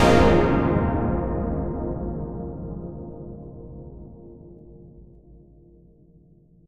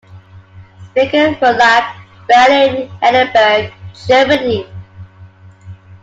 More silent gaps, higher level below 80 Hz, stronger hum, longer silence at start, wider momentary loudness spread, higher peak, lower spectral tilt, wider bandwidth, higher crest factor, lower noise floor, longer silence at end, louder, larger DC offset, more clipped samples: neither; first, -34 dBFS vs -50 dBFS; neither; second, 0 s vs 0.15 s; first, 26 LU vs 18 LU; second, -4 dBFS vs 0 dBFS; first, -7 dB/octave vs -4.5 dB/octave; first, 14 kHz vs 7.8 kHz; first, 20 dB vs 14 dB; first, -54 dBFS vs -39 dBFS; first, 1.65 s vs 0.1 s; second, -24 LUFS vs -11 LUFS; neither; neither